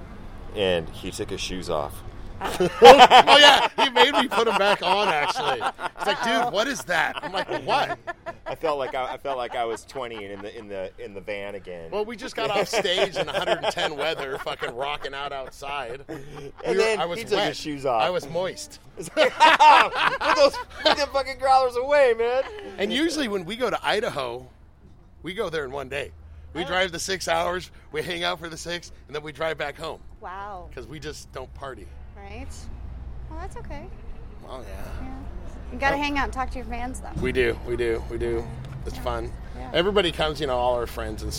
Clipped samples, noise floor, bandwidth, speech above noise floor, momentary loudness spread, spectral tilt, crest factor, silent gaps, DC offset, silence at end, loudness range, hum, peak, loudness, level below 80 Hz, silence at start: under 0.1%; -49 dBFS; 16.5 kHz; 26 dB; 20 LU; -3.5 dB/octave; 24 dB; none; under 0.1%; 0 s; 19 LU; none; 0 dBFS; -22 LUFS; -42 dBFS; 0 s